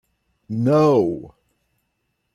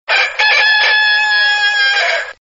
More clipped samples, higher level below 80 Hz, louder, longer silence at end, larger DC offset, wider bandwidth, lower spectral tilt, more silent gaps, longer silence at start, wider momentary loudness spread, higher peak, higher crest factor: neither; about the same, -60 dBFS vs -60 dBFS; second, -19 LUFS vs -10 LUFS; first, 1.05 s vs 0.1 s; neither; first, 12 kHz vs 7.8 kHz; first, -8.5 dB/octave vs 7.5 dB/octave; neither; first, 0.5 s vs 0.1 s; first, 15 LU vs 4 LU; second, -6 dBFS vs 0 dBFS; about the same, 16 dB vs 12 dB